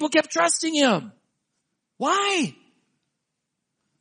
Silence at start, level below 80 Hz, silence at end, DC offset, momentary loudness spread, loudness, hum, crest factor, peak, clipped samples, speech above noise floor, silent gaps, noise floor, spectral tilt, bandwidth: 0 s; -78 dBFS; 1.5 s; under 0.1%; 8 LU; -22 LUFS; none; 20 dB; -6 dBFS; under 0.1%; 58 dB; none; -80 dBFS; -2.5 dB/octave; 10 kHz